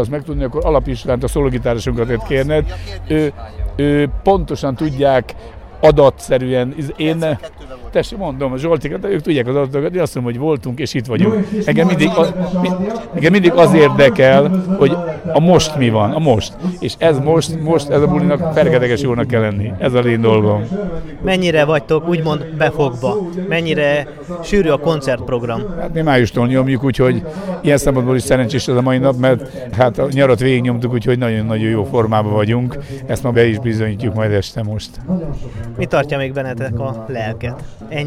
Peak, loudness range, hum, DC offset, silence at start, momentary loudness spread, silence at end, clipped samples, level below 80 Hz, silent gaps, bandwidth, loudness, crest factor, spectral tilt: 0 dBFS; 6 LU; none; under 0.1%; 0 s; 10 LU; 0 s; under 0.1%; -32 dBFS; none; 15 kHz; -15 LUFS; 14 dB; -6.5 dB/octave